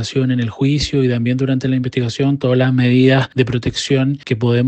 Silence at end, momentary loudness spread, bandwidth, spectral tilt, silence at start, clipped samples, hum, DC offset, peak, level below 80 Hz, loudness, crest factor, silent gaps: 0 s; 6 LU; 8.6 kHz; -6.5 dB/octave; 0 s; under 0.1%; none; under 0.1%; 0 dBFS; -42 dBFS; -16 LUFS; 14 dB; none